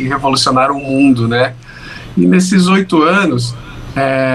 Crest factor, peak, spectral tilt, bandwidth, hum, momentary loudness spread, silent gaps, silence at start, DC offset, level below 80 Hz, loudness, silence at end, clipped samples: 12 dB; 0 dBFS; -5.5 dB/octave; 12.5 kHz; none; 14 LU; none; 0 s; under 0.1%; -40 dBFS; -12 LUFS; 0 s; under 0.1%